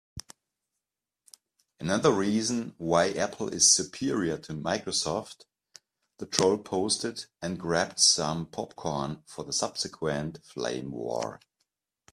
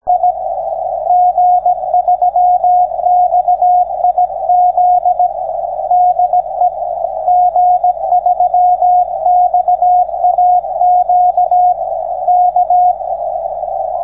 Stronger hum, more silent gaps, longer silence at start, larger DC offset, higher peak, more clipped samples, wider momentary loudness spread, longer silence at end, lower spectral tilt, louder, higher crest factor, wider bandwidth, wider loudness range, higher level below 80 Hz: neither; neither; about the same, 0.15 s vs 0.05 s; second, under 0.1% vs 0.2%; about the same, -2 dBFS vs -2 dBFS; neither; first, 16 LU vs 8 LU; first, 0.75 s vs 0 s; second, -2.5 dB/octave vs -10.5 dB/octave; second, -28 LUFS vs -12 LUFS; first, 28 dB vs 10 dB; first, 14.5 kHz vs 1.5 kHz; first, 7 LU vs 2 LU; second, -62 dBFS vs -48 dBFS